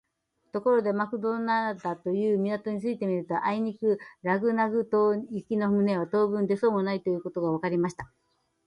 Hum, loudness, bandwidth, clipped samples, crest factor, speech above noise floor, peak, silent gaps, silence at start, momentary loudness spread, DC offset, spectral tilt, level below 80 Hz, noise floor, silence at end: none; -27 LUFS; 10 kHz; under 0.1%; 16 dB; 48 dB; -12 dBFS; none; 0.55 s; 6 LU; under 0.1%; -8 dB/octave; -68 dBFS; -75 dBFS; 0.6 s